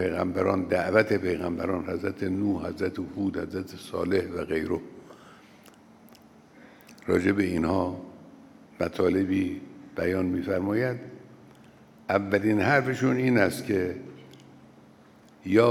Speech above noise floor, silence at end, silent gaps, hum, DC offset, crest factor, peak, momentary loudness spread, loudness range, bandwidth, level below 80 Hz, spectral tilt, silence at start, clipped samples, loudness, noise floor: 28 dB; 0 s; none; none; under 0.1%; 20 dB; -6 dBFS; 16 LU; 6 LU; 16 kHz; -62 dBFS; -7 dB/octave; 0 s; under 0.1%; -27 LUFS; -54 dBFS